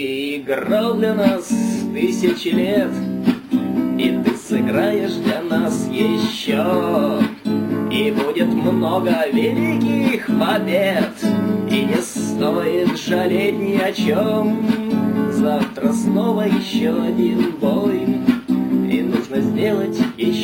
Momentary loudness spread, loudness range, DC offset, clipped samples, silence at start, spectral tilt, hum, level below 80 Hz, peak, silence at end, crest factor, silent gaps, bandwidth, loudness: 3 LU; 1 LU; under 0.1%; under 0.1%; 0 s; -6 dB/octave; none; -56 dBFS; -2 dBFS; 0 s; 16 dB; none; 17 kHz; -18 LUFS